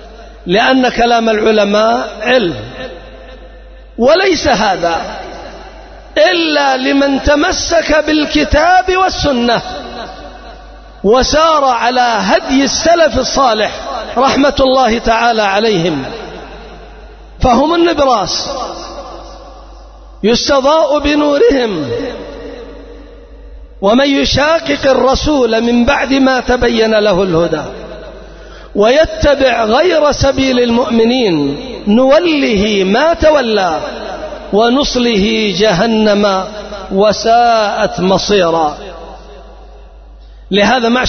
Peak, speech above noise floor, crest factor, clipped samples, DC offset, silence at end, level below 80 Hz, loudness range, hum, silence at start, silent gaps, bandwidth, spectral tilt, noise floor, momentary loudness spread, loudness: 0 dBFS; 24 dB; 12 dB; under 0.1%; under 0.1%; 0 s; -30 dBFS; 4 LU; none; 0 s; none; 6.6 kHz; -4.5 dB/octave; -34 dBFS; 17 LU; -11 LUFS